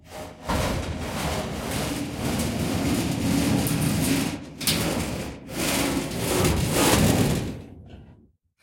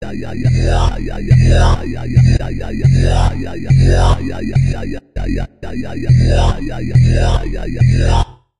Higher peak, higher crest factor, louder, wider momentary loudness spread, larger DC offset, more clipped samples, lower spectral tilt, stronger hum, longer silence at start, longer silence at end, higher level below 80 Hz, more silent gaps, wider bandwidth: second, -6 dBFS vs 0 dBFS; first, 20 dB vs 12 dB; second, -25 LUFS vs -15 LUFS; about the same, 10 LU vs 12 LU; second, under 0.1% vs 3%; neither; second, -4.5 dB/octave vs -7 dB/octave; neither; about the same, 0.05 s vs 0 s; first, 0.5 s vs 0 s; second, -40 dBFS vs -18 dBFS; neither; first, 17 kHz vs 10.5 kHz